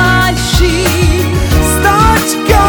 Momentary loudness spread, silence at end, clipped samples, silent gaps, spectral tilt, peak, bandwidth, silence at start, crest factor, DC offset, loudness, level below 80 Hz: 3 LU; 0 s; 0.3%; none; -4.5 dB/octave; 0 dBFS; over 20 kHz; 0 s; 10 dB; under 0.1%; -10 LUFS; -16 dBFS